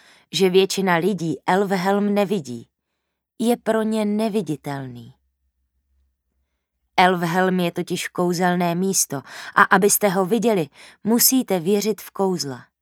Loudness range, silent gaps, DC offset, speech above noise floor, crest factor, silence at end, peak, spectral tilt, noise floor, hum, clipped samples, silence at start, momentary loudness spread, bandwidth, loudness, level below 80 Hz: 7 LU; none; under 0.1%; 58 dB; 22 dB; 0.2 s; 0 dBFS; -4 dB/octave; -78 dBFS; none; under 0.1%; 0.35 s; 12 LU; 19 kHz; -20 LUFS; -68 dBFS